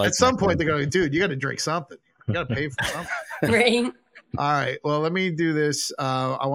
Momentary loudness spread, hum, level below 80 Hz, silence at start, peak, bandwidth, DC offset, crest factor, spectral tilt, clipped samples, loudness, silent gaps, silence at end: 10 LU; none; -52 dBFS; 0 s; -4 dBFS; 16.5 kHz; under 0.1%; 20 dB; -4.5 dB/octave; under 0.1%; -23 LUFS; none; 0 s